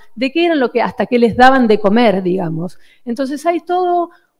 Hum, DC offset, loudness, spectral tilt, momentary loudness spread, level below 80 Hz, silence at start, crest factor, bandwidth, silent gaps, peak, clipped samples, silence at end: none; under 0.1%; -14 LUFS; -6.5 dB/octave; 13 LU; -46 dBFS; 0.05 s; 14 dB; 13 kHz; none; 0 dBFS; under 0.1%; 0.3 s